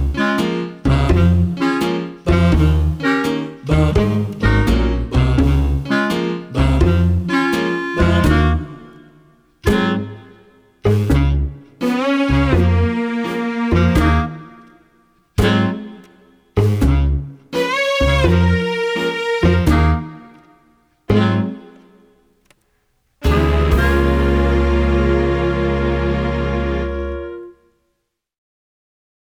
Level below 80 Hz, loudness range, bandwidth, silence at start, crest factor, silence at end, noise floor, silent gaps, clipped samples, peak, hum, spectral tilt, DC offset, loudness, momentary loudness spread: -22 dBFS; 4 LU; 14 kHz; 0 s; 14 dB; 1.7 s; -72 dBFS; none; under 0.1%; -2 dBFS; none; -7 dB/octave; under 0.1%; -17 LUFS; 9 LU